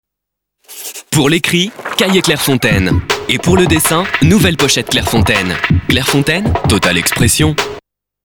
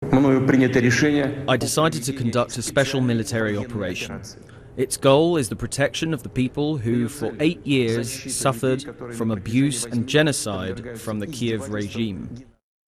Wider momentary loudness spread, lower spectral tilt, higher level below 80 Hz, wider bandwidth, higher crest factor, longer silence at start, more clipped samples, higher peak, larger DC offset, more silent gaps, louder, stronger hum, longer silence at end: second, 6 LU vs 12 LU; about the same, -4 dB/octave vs -5 dB/octave; first, -30 dBFS vs -48 dBFS; first, over 20 kHz vs 14.5 kHz; second, 12 dB vs 18 dB; first, 0.7 s vs 0 s; neither; first, 0 dBFS vs -4 dBFS; neither; neither; first, -12 LUFS vs -22 LUFS; neither; about the same, 0.45 s vs 0.45 s